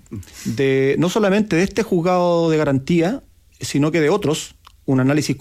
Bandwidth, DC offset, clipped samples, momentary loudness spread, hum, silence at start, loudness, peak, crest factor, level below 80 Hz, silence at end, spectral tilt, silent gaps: 15.5 kHz; under 0.1%; under 0.1%; 13 LU; none; 0.1 s; -18 LUFS; -6 dBFS; 12 dB; -50 dBFS; 0 s; -6 dB/octave; none